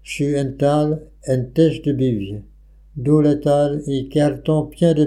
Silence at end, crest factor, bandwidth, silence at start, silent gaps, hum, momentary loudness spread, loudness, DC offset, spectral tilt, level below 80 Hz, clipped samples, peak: 0 s; 16 dB; 12 kHz; 0.05 s; none; none; 10 LU; -19 LUFS; under 0.1%; -7.5 dB/octave; -44 dBFS; under 0.1%; -4 dBFS